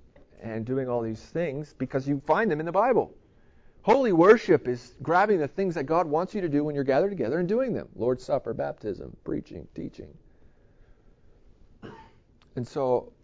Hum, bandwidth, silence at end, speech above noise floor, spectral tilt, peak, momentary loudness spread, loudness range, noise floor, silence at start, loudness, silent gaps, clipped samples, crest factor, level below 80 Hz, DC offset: none; 7.8 kHz; 0.15 s; 31 dB; -7.5 dB/octave; -6 dBFS; 17 LU; 17 LU; -57 dBFS; 0.4 s; -26 LUFS; none; under 0.1%; 20 dB; -56 dBFS; under 0.1%